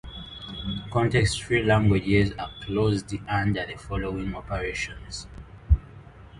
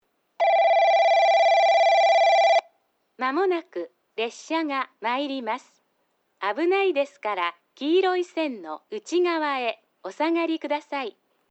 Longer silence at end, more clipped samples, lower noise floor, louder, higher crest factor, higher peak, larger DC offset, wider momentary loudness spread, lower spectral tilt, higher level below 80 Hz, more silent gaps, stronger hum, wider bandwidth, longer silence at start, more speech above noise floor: second, 0 s vs 0.4 s; neither; second, -46 dBFS vs -71 dBFS; second, -26 LUFS vs -23 LUFS; first, 18 dB vs 12 dB; about the same, -8 dBFS vs -10 dBFS; neither; about the same, 16 LU vs 14 LU; first, -6 dB/octave vs -2 dB/octave; first, -34 dBFS vs under -90 dBFS; neither; neither; first, 11.5 kHz vs 8.2 kHz; second, 0.05 s vs 0.4 s; second, 21 dB vs 45 dB